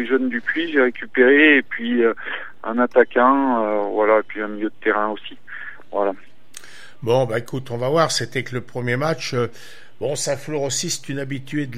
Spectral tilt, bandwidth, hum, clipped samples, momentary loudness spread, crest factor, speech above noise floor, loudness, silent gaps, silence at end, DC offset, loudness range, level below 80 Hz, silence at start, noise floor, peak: -4.5 dB/octave; 15.5 kHz; none; under 0.1%; 14 LU; 20 dB; 24 dB; -20 LUFS; none; 0 s; 2%; 7 LU; -66 dBFS; 0 s; -44 dBFS; 0 dBFS